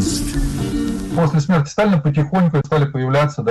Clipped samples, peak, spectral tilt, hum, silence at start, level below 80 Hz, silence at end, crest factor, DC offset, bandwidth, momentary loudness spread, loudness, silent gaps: under 0.1%; -8 dBFS; -6.5 dB/octave; none; 0 s; -30 dBFS; 0 s; 8 dB; under 0.1%; 12.5 kHz; 6 LU; -18 LUFS; none